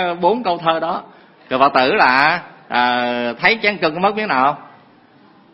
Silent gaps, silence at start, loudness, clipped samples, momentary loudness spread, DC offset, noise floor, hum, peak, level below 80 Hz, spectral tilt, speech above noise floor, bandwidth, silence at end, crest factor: none; 0 s; -16 LUFS; under 0.1%; 10 LU; under 0.1%; -49 dBFS; none; 0 dBFS; -58 dBFS; -6.5 dB/octave; 32 dB; 6 kHz; 0.85 s; 18 dB